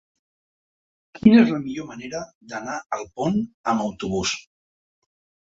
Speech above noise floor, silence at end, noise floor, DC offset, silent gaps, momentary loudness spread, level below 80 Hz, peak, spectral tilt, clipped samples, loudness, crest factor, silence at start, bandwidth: over 68 dB; 1.1 s; under -90 dBFS; under 0.1%; 2.35-2.41 s, 2.86-2.90 s, 3.54-3.64 s; 18 LU; -54 dBFS; -2 dBFS; -5.5 dB/octave; under 0.1%; -22 LUFS; 22 dB; 1.25 s; 7.8 kHz